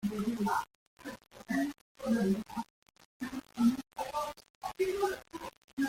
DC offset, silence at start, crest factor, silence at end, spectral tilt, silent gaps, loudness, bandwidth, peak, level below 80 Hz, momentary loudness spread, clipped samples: under 0.1%; 0 s; 18 dB; 0 s; -5.5 dB/octave; 0.75-0.97 s, 1.81-1.95 s, 2.70-2.82 s, 3.05-3.20 s, 4.50-4.61 s, 5.57-5.77 s; -35 LUFS; 16.5 kHz; -18 dBFS; -64 dBFS; 17 LU; under 0.1%